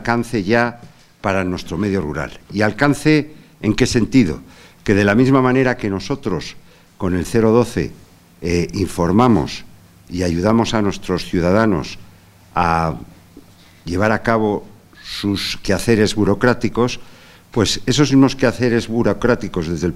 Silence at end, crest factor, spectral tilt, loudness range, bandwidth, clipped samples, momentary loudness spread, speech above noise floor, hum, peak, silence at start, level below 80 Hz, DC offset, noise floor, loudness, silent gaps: 0 s; 18 dB; -6 dB/octave; 4 LU; 15.5 kHz; under 0.1%; 12 LU; 29 dB; none; 0 dBFS; 0 s; -38 dBFS; under 0.1%; -45 dBFS; -17 LUFS; none